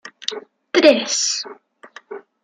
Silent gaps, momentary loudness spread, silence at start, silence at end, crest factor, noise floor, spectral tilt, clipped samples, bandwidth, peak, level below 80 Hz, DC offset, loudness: none; 23 LU; 0.05 s; 0.25 s; 20 dB; -40 dBFS; -1 dB/octave; under 0.1%; 11 kHz; -2 dBFS; -70 dBFS; under 0.1%; -17 LUFS